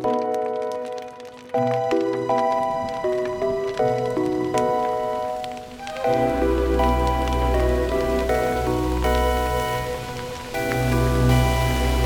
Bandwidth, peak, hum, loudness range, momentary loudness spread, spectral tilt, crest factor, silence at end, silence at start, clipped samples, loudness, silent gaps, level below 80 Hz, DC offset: 19 kHz; -6 dBFS; none; 3 LU; 9 LU; -6 dB/octave; 16 dB; 0 s; 0 s; under 0.1%; -23 LUFS; none; -30 dBFS; under 0.1%